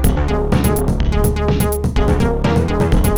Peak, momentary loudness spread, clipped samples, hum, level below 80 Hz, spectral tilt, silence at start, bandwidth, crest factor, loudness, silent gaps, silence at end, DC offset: -2 dBFS; 2 LU; under 0.1%; none; -18 dBFS; -6.5 dB/octave; 0 s; 19.5 kHz; 12 dB; -17 LUFS; none; 0 s; under 0.1%